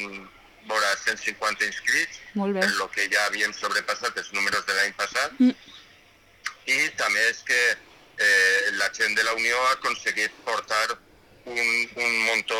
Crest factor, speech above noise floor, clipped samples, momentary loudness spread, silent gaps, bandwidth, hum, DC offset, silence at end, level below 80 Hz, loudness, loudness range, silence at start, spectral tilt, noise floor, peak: 18 dB; 31 dB; under 0.1%; 8 LU; none; 18 kHz; none; under 0.1%; 0 s; -66 dBFS; -23 LUFS; 4 LU; 0 s; -1.5 dB/octave; -56 dBFS; -8 dBFS